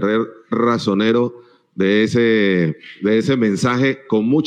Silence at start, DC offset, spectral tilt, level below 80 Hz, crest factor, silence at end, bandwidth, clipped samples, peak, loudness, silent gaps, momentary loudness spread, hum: 0 s; under 0.1%; -6.5 dB/octave; -62 dBFS; 10 dB; 0 s; 10 kHz; under 0.1%; -6 dBFS; -17 LUFS; none; 8 LU; none